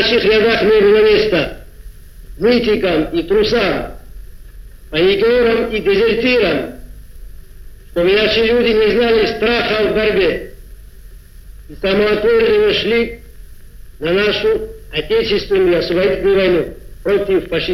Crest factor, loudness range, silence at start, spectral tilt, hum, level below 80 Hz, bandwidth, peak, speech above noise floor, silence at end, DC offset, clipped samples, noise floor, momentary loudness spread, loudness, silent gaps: 14 dB; 3 LU; 0 s; -6 dB/octave; none; -34 dBFS; 15 kHz; 0 dBFS; 23 dB; 0 s; under 0.1%; under 0.1%; -36 dBFS; 10 LU; -14 LUFS; none